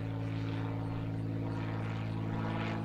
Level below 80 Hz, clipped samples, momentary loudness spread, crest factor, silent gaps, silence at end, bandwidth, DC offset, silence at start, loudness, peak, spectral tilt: -52 dBFS; under 0.1%; 2 LU; 10 dB; none; 0 s; 7.2 kHz; under 0.1%; 0 s; -37 LUFS; -24 dBFS; -8.5 dB/octave